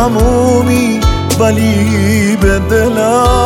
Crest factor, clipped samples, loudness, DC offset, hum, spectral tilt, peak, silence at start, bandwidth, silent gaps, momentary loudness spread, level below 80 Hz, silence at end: 10 dB; under 0.1%; -11 LUFS; under 0.1%; none; -5.5 dB/octave; 0 dBFS; 0 s; 17 kHz; none; 2 LU; -20 dBFS; 0 s